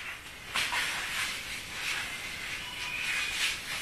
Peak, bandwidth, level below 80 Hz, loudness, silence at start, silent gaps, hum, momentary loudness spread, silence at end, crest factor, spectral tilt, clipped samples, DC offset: -16 dBFS; 14 kHz; -56 dBFS; -32 LUFS; 0 s; none; none; 7 LU; 0 s; 20 dB; 0 dB/octave; under 0.1%; under 0.1%